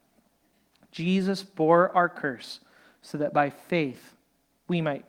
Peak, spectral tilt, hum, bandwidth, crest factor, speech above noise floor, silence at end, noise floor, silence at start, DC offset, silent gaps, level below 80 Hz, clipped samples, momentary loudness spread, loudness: -8 dBFS; -6.5 dB/octave; none; 15.5 kHz; 20 dB; 44 dB; 0.1 s; -69 dBFS; 0.95 s; under 0.1%; none; -72 dBFS; under 0.1%; 20 LU; -26 LUFS